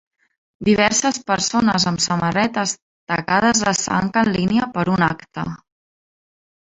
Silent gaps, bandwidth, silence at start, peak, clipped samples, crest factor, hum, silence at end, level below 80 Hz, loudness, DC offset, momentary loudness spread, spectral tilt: 2.82-3.07 s; 8.4 kHz; 0.6 s; -2 dBFS; under 0.1%; 18 dB; none; 1.2 s; -50 dBFS; -18 LUFS; under 0.1%; 11 LU; -3.5 dB/octave